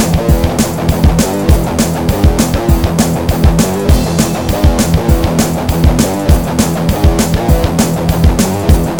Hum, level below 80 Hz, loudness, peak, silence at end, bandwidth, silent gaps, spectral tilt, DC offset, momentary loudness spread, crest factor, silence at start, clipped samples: none; -16 dBFS; -12 LUFS; 0 dBFS; 0 s; over 20 kHz; none; -5.5 dB/octave; 1%; 2 LU; 10 dB; 0 s; 0.6%